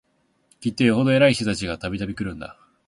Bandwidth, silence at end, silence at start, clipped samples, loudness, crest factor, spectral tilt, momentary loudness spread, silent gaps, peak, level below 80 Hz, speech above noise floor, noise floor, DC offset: 11.5 kHz; 0.35 s; 0.6 s; under 0.1%; -22 LUFS; 18 dB; -6 dB/octave; 14 LU; none; -4 dBFS; -48 dBFS; 42 dB; -63 dBFS; under 0.1%